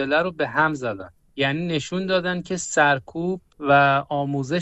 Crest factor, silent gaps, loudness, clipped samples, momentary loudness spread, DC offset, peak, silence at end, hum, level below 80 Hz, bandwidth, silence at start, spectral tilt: 16 dB; none; -22 LUFS; under 0.1%; 11 LU; under 0.1%; -6 dBFS; 0 s; none; -56 dBFS; 8.4 kHz; 0 s; -4.5 dB/octave